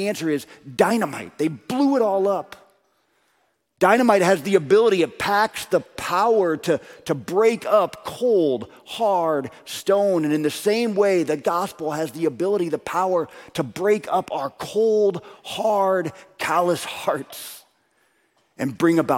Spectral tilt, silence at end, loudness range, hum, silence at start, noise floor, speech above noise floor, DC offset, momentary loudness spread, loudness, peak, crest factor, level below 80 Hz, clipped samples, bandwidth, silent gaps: -5 dB/octave; 0 s; 4 LU; none; 0 s; -67 dBFS; 46 dB; under 0.1%; 11 LU; -21 LUFS; -2 dBFS; 20 dB; -64 dBFS; under 0.1%; 16.5 kHz; none